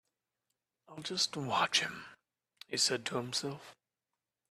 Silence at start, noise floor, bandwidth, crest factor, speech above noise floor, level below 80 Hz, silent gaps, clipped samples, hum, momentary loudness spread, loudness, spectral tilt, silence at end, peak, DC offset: 0.9 s; under -90 dBFS; 14.5 kHz; 22 dB; over 55 dB; -78 dBFS; none; under 0.1%; none; 19 LU; -33 LUFS; -2 dB/octave; 0.75 s; -16 dBFS; under 0.1%